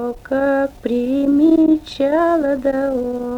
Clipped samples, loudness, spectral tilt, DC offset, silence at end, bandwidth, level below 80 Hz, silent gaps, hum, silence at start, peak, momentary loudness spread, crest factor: under 0.1%; -17 LUFS; -6.5 dB/octave; under 0.1%; 0 s; 8.6 kHz; -44 dBFS; none; none; 0 s; -4 dBFS; 8 LU; 12 dB